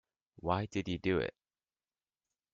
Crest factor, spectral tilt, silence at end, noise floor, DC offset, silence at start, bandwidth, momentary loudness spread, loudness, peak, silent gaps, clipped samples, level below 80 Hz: 22 dB; -5 dB/octave; 1.25 s; under -90 dBFS; under 0.1%; 0.45 s; 7.6 kHz; 8 LU; -36 LUFS; -16 dBFS; none; under 0.1%; -62 dBFS